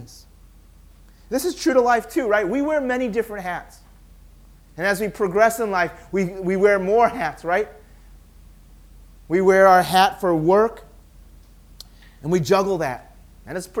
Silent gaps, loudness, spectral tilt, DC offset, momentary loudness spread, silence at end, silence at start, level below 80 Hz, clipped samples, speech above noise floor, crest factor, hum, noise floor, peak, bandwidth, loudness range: none; -20 LUFS; -5 dB/octave; under 0.1%; 13 LU; 0 s; 0 s; -48 dBFS; under 0.1%; 29 dB; 20 dB; none; -48 dBFS; -2 dBFS; 18 kHz; 5 LU